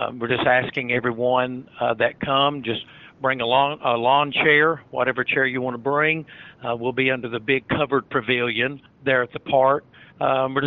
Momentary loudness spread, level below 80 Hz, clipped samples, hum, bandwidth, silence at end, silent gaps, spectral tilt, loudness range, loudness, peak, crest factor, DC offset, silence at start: 8 LU; -58 dBFS; under 0.1%; none; 5.4 kHz; 0 s; none; -2.5 dB/octave; 3 LU; -21 LUFS; -4 dBFS; 18 dB; under 0.1%; 0 s